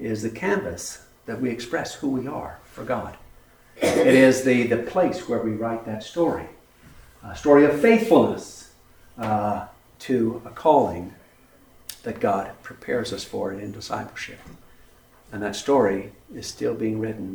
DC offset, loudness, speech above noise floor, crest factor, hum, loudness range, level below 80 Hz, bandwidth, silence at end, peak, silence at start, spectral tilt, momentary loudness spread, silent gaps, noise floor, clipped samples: under 0.1%; -23 LUFS; 31 dB; 22 dB; none; 9 LU; -54 dBFS; over 20 kHz; 0 s; -2 dBFS; 0 s; -5.5 dB/octave; 21 LU; none; -54 dBFS; under 0.1%